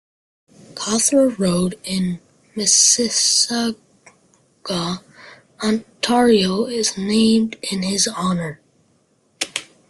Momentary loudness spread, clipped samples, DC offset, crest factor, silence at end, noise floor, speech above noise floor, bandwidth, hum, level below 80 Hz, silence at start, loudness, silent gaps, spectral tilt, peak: 14 LU; under 0.1%; under 0.1%; 20 dB; 0.25 s; -61 dBFS; 43 dB; 12.5 kHz; none; -54 dBFS; 0.75 s; -18 LUFS; none; -3 dB/octave; 0 dBFS